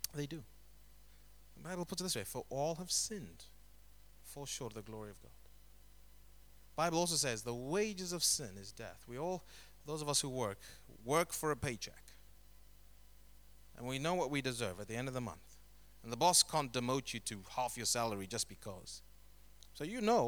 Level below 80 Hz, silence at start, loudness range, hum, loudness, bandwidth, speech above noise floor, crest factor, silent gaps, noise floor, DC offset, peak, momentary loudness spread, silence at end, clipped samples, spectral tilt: -64 dBFS; 0 s; 7 LU; 50 Hz at -65 dBFS; -38 LUFS; over 20 kHz; 24 dB; 24 dB; none; -62 dBFS; under 0.1%; -16 dBFS; 18 LU; 0 s; under 0.1%; -3 dB/octave